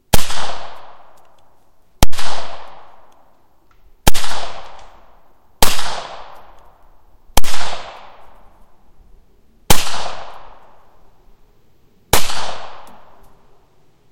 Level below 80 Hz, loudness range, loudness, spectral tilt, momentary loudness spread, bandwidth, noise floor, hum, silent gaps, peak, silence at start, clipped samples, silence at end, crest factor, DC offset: -30 dBFS; 5 LU; -21 LUFS; -2.5 dB/octave; 24 LU; 16.5 kHz; -54 dBFS; none; none; 0 dBFS; 0.15 s; 1%; 1.35 s; 12 dB; under 0.1%